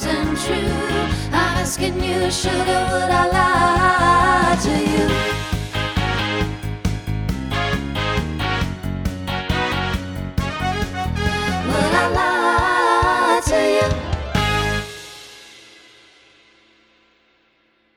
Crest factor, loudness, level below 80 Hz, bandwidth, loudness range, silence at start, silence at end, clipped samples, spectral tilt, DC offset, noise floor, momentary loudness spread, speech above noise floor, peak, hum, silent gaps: 18 dB; -19 LUFS; -32 dBFS; 20 kHz; 7 LU; 0 s; 2.35 s; under 0.1%; -4.5 dB/octave; under 0.1%; -61 dBFS; 10 LU; 42 dB; -2 dBFS; none; none